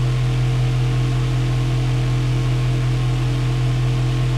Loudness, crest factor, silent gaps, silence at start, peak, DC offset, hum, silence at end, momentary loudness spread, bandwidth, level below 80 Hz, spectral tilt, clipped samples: -20 LUFS; 8 dB; none; 0 s; -10 dBFS; under 0.1%; none; 0 s; 1 LU; 10.5 kHz; -28 dBFS; -7 dB/octave; under 0.1%